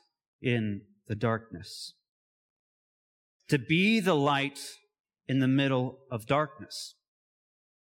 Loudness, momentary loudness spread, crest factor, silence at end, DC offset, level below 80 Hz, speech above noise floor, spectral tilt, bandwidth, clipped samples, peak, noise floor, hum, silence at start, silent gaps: -29 LUFS; 18 LU; 20 dB; 1.1 s; under 0.1%; -70 dBFS; over 61 dB; -6 dB/octave; 17 kHz; under 0.1%; -12 dBFS; under -90 dBFS; none; 0.4 s; 2.09-3.40 s, 5.00-5.04 s